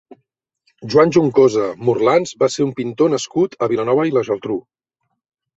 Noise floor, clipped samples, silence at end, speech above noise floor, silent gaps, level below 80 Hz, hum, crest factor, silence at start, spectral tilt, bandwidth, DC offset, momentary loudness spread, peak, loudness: -74 dBFS; under 0.1%; 0.95 s; 58 dB; none; -58 dBFS; none; 16 dB; 0.8 s; -6 dB/octave; 8 kHz; under 0.1%; 8 LU; 0 dBFS; -17 LUFS